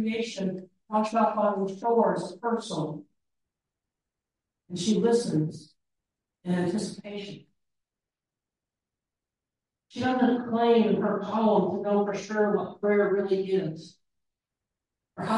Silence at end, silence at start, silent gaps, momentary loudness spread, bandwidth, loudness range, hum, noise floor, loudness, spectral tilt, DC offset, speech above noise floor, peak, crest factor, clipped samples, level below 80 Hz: 0 s; 0 s; none; 15 LU; 11.5 kHz; 11 LU; none; under -90 dBFS; -27 LUFS; -6 dB/octave; under 0.1%; over 64 dB; -12 dBFS; 16 dB; under 0.1%; -72 dBFS